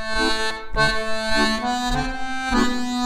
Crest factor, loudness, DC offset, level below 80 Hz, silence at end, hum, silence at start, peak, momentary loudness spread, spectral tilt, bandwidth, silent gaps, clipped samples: 16 dB; -22 LUFS; under 0.1%; -32 dBFS; 0 s; none; 0 s; -4 dBFS; 5 LU; -3.5 dB/octave; 15.5 kHz; none; under 0.1%